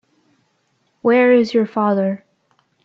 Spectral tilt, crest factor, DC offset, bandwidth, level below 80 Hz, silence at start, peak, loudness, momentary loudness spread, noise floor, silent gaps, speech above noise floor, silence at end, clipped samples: -7.5 dB/octave; 16 dB; under 0.1%; 7.2 kHz; -68 dBFS; 1.05 s; -4 dBFS; -16 LUFS; 10 LU; -65 dBFS; none; 50 dB; 0.65 s; under 0.1%